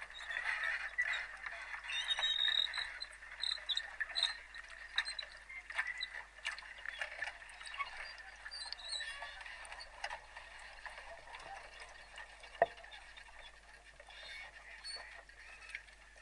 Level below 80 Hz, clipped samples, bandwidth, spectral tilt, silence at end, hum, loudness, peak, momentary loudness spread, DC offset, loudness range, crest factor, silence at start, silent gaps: -66 dBFS; under 0.1%; 11.5 kHz; 0.5 dB/octave; 0 s; none; -40 LUFS; -16 dBFS; 17 LU; under 0.1%; 11 LU; 28 dB; 0 s; none